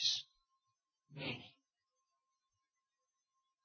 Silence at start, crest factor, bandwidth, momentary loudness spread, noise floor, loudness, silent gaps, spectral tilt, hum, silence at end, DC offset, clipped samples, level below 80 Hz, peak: 0 s; 26 dB; 6.4 kHz; 21 LU; under -90 dBFS; -42 LUFS; none; -1 dB/octave; none; 2.15 s; under 0.1%; under 0.1%; -82 dBFS; -22 dBFS